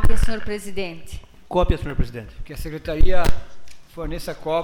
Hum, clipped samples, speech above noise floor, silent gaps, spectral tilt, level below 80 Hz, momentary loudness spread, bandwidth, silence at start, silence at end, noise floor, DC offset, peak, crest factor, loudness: none; under 0.1%; 18 dB; none; -6 dB/octave; -24 dBFS; 17 LU; 12.5 kHz; 0 s; 0 s; -35 dBFS; under 0.1%; -4 dBFS; 14 dB; -26 LUFS